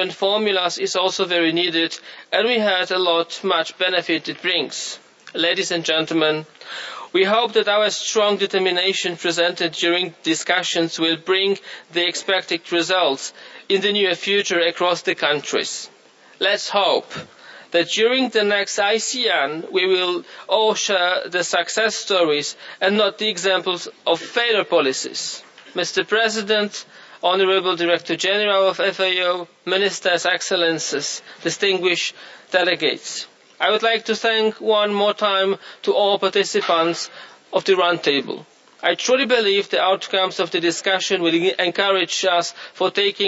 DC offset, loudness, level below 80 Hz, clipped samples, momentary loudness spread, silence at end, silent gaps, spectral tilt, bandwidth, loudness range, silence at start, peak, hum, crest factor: under 0.1%; -19 LUFS; -76 dBFS; under 0.1%; 8 LU; 0 s; none; -2.5 dB/octave; 8 kHz; 2 LU; 0 s; -4 dBFS; none; 18 dB